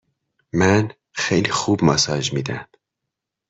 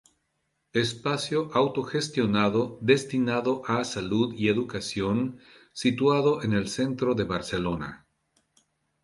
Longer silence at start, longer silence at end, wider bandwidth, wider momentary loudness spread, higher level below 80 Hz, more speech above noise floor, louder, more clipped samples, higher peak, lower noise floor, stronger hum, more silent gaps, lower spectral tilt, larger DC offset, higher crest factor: second, 0.55 s vs 0.75 s; second, 0.85 s vs 1.05 s; second, 8.4 kHz vs 11.5 kHz; first, 11 LU vs 6 LU; about the same, -52 dBFS vs -56 dBFS; first, 64 dB vs 50 dB; first, -20 LUFS vs -26 LUFS; neither; first, -2 dBFS vs -6 dBFS; first, -82 dBFS vs -76 dBFS; neither; neither; about the same, -4.5 dB/octave vs -5.5 dB/octave; neither; about the same, 18 dB vs 20 dB